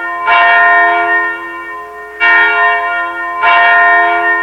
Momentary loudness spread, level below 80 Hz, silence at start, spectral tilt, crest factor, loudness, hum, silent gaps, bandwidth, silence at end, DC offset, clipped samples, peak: 16 LU; -50 dBFS; 0 s; -3 dB/octave; 10 dB; -8 LUFS; none; none; 9.6 kHz; 0 s; under 0.1%; under 0.1%; 0 dBFS